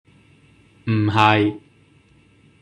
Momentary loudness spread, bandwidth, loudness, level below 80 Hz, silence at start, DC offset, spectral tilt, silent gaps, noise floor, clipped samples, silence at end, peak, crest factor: 18 LU; 9 kHz; -18 LUFS; -60 dBFS; 0.85 s; under 0.1%; -7 dB/octave; none; -54 dBFS; under 0.1%; 1.05 s; -2 dBFS; 20 dB